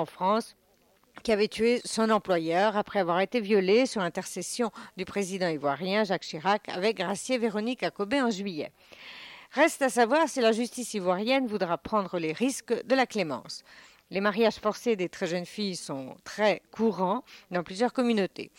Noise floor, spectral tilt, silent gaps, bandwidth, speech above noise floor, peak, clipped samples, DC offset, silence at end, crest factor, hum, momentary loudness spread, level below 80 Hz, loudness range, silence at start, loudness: -65 dBFS; -4.5 dB/octave; none; 16.5 kHz; 37 dB; -12 dBFS; under 0.1%; under 0.1%; 0.15 s; 16 dB; none; 11 LU; -68 dBFS; 4 LU; 0 s; -28 LUFS